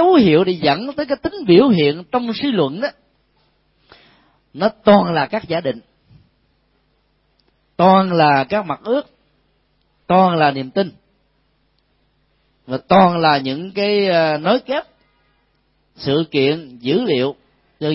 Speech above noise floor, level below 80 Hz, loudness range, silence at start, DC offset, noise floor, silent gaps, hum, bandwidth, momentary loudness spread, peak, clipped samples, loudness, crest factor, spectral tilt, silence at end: 47 dB; -54 dBFS; 4 LU; 0 s; under 0.1%; -62 dBFS; none; none; 5.8 kHz; 12 LU; 0 dBFS; under 0.1%; -16 LUFS; 18 dB; -10.5 dB/octave; 0 s